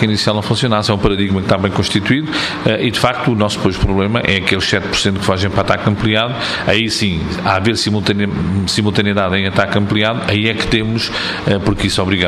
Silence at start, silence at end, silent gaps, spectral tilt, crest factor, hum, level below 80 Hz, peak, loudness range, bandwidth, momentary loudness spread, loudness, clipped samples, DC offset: 0 s; 0 s; none; -5 dB/octave; 14 dB; none; -32 dBFS; 0 dBFS; 0 LU; 13.5 kHz; 3 LU; -15 LUFS; under 0.1%; under 0.1%